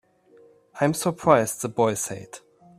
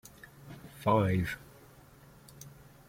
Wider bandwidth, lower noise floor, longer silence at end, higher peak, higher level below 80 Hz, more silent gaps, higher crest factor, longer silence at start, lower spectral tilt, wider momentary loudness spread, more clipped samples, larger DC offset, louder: about the same, 15.5 kHz vs 16.5 kHz; about the same, -55 dBFS vs -56 dBFS; about the same, 0.4 s vs 0.4 s; first, -2 dBFS vs -14 dBFS; about the same, -62 dBFS vs -58 dBFS; neither; about the same, 24 dB vs 22 dB; first, 0.75 s vs 0.45 s; second, -5 dB/octave vs -7 dB/octave; second, 19 LU vs 25 LU; neither; neither; first, -23 LUFS vs -31 LUFS